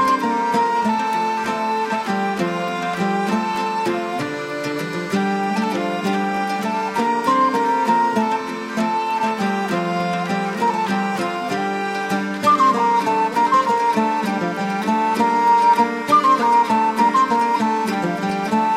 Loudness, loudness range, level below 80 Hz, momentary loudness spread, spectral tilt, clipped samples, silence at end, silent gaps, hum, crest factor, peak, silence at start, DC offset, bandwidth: -19 LUFS; 5 LU; -64 dBFS; 7 LU; -5 dB/octave; under 0.1%; 0 s; none; none; 14 dB; -4 dBFS; 0 s; under 0.1%; 15.5 kHz